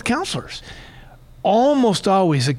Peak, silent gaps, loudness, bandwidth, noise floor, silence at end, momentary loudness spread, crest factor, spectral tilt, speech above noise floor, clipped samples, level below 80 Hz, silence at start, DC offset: -6 dBFS; none; -18 LUFS; 15 kHz; -43 dBFS; 0 s; 18 LU; 12 dB; -5.5 dB/octave; 25 dB; under 0.1%; -46 dBFS; 0.05 s; under 0.1%